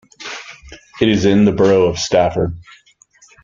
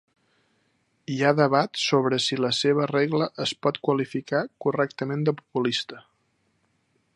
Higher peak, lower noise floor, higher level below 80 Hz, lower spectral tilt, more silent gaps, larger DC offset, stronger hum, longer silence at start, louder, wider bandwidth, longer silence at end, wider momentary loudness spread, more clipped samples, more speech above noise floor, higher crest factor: about the same, -2 dBFS vs -4 dBFS; second, -51 dBFS vs -70 dBFS; first, -44 dBFS vs -72 dBFS; about the same, -5.5 dB/octave vs -5 dB/octave; neither; neither; neither; second, 0.2 s vs 1.1 s; first, -14 LUFS vs -24 LUFS; second, 7.6 kHz vs 11.5 kHz; second, 0.8 s vs 1.15 s; first, 18 LU vs 6 LU; neither; second, 37 dB vs 46 dB; second, 16 dB vs 22 dB